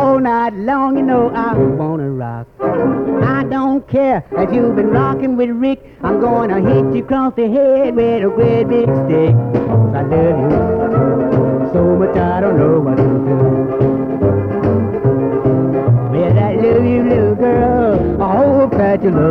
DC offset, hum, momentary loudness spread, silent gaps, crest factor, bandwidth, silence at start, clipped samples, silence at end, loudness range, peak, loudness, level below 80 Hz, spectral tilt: under 0.1%; none; 4 LU; none; 12 dB; 5.4 kHz; 0 s; under 0.1%; 0 s; 3 LU; 0 dBFS; -14 LUFS; -36 dBFS; -11 dB/octave